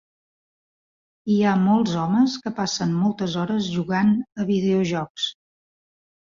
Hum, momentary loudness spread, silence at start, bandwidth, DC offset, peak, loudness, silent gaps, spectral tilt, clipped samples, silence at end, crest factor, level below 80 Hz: none; 7 LU; 1.25 s; 7.6 kHz; under 0.1%; -8 dBFS; -22 LUFS; 5.10-5.15 s; -6 dB/octave; under 0.1%; 0.95 s; 14 dB; -60 dBFS